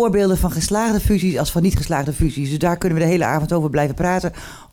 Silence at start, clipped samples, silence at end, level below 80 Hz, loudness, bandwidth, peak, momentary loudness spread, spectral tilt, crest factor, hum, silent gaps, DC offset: 0 s; under 0.1%; 0.1 s; -30 dBFS; -19 LUFS; 18.5 kHz; -8 dBFS; 4 LU; -6 dB/octave; 10 dB; none; none; under 0.1%